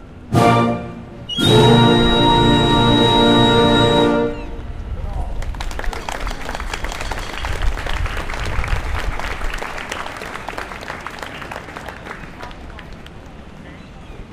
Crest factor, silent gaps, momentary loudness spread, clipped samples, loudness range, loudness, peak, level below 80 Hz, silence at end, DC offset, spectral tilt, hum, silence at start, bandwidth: 18 dB; none; 23 LU; under 0.1%; 17 LU; -17 LUFS; 0 dBFS; -28 dBFS; 0 s; under 0.1%; -5.5 dB/octave; none; 0 s; 15.5 kHz